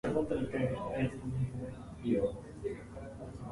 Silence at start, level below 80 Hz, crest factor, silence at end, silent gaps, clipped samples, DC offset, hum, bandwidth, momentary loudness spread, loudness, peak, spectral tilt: 0.05 s; -52 dBFS; 18 dB; 0 s; none; under 0.1%; under 0.1%; none; 11.5 kHz; 12 LU; -37 LUFS; -18 dBFS; -8 dB/octave